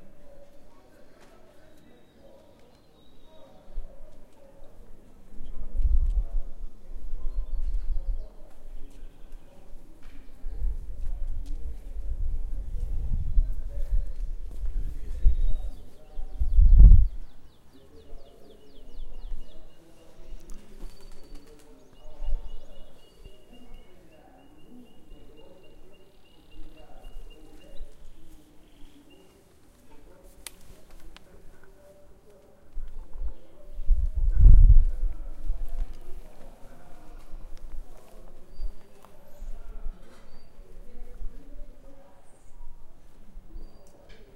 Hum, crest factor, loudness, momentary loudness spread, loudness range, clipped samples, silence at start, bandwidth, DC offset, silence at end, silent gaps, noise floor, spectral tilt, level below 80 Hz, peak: none; 24 dB; -28 LUFS; 24 LU; 27 LU; under 0.1%; 0 s; 3 kHz; under 0.1%; 0.1 s; none; -55 dBFS; -7.5 dB/octave; -26 dBFS; -2 dBFS